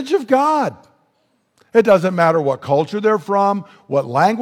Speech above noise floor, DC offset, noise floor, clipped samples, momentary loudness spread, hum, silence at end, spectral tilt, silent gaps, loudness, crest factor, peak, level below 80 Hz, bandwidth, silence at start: 48 dB; under 0.1%; -64 dBFS; under 0.1%; 8 LU; none; 0 s; -6.5 dB/octave; none; -17 LUFS; 16 dB; -2 dBFS; -64 dBFS; 15 kHz; 0 s